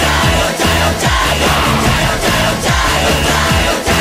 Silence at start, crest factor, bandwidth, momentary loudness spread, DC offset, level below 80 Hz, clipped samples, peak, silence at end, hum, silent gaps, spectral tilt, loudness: 0 s; 12 dB; 16 kHz; 1 LU; under 0.1%; -22 dBFS; under 0.1%; 0 dBFS; 0 s; none; none; -3.5 dB/octave; -12 LUFS